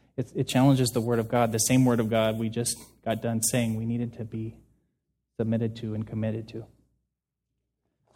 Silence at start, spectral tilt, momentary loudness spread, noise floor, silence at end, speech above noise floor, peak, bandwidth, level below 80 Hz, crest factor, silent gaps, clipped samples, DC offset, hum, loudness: 0.2 s; -5 dB/octave; 14 LU; -84 dBFS; 1.5 s; 58 dB; -10 dBFS; 17 kHz; -58 dBFS; 18 dB; none; under 0.1%; under 0.1%; none; -27 LUFS